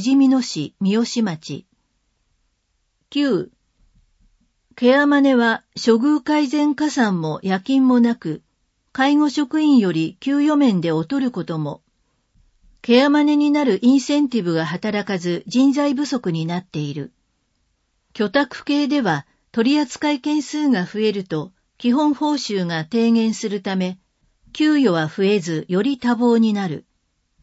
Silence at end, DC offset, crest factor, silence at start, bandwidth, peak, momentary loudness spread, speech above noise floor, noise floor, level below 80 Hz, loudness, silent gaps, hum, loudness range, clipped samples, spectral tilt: 0.65 s; under 0.1%; 16 dB; 0 s; 8 kHz; -2 dBFS; 12 LU; 51 dB; -69 dBFS; -64 dBFS; -19 LUFS; none; none; 6 LU; under 0.1%; -5.5 dB/octave